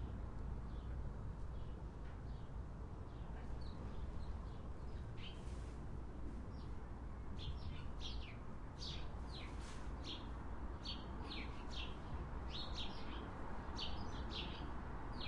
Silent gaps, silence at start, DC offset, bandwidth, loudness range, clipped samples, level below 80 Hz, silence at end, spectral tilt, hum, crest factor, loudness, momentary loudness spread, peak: none; 0 s; under 0.1%; 10.5 kHz; 3 LU; under 0.1%; -50 dBFS; 0 s; -5.5 dB/octave; none; 16 dB; -50 LUFS; 5 LU; -32 dBFS